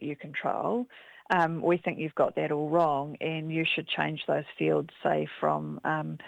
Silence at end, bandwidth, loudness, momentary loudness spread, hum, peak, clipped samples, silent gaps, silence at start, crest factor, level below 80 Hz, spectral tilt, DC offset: 0 s; 9 kHz; -29 LUFS; 7 LU; none; -8 dBFS; under 0.1%; none; 0 s; 20 dB; -72 dBFS; -7.5 dB/octave; under 0.1%